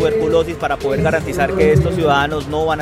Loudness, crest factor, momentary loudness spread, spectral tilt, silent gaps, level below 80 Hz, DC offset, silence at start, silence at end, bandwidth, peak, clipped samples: -16 LUFS; 14 dB; 6 LU; -6.5 dB/octave; none; -34 dBFS; under 0.1%; 0 s; 0 s; 15.5 kHz; -2 dBFS; under 0.1%